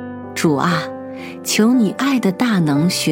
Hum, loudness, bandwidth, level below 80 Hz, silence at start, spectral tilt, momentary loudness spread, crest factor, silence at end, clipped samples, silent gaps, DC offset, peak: none; -17 LUFS; 17 kHz; -62 dBFS; 0 s; -5 dB/octave; 13 LU; 14 dB; 0 s; under 0.1%; none; under 0.1%; -2 dBFS